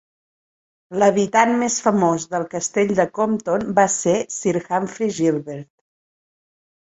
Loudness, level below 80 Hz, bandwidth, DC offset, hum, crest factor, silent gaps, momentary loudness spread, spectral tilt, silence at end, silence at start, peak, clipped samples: -19 LUFS; -60 dBFS; 8.2 kHz; under 0.1%; none; 20 dB; none; 8 LU; -4.5 dB/octave; 1.25 s; 0.9 s; 0 dBFS; under 0.1%